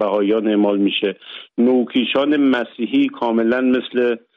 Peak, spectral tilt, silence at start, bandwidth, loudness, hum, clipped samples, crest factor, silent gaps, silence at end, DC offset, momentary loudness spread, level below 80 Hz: -6 dBFS; -7.5 dB/octave; 0 s; 4.9 kHz; -18 LUFS; none; under 0.1%; 10 dB; none; 0.2 s; under 0.1%; 5 LU; -64 dBFS